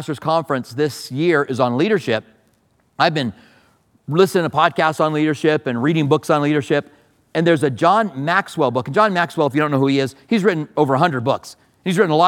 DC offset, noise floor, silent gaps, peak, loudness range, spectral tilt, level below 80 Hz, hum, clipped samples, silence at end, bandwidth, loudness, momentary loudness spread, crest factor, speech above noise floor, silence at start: under 0.1%; -60 dBFS; none; 0 dBFS; 3 LU; -6 dB/octave; -66 dBFS; none; under 0.1%; 0 s; 17 kHz; -18 LUFS; 6 LU; 18 dB; 43 dB; 0 s